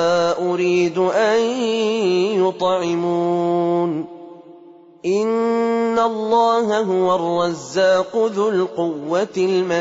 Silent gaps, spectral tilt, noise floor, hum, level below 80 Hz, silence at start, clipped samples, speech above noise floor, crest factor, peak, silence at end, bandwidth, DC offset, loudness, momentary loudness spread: none; -5.5 dB/octave; -44 dBFS; none; -64 dBFS; 0 s; under 0.1%; 26 dB; 12 dB; -6 dBFS; 0 s; 7.8 kHz; under 0.1%; -19 LUFS; 5 LU